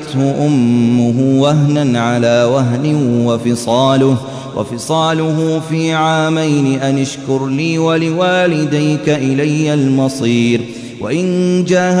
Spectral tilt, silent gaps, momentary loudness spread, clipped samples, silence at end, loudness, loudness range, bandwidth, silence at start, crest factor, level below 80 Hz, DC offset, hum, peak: -6 dB/octave; none; 6 LU; under 0.1%; 0 s; -13 LUFS; 2 LU; 11 kHz; 0 s; 12 dB; -54 dBFS; under 0.1%; none; -2 dBFS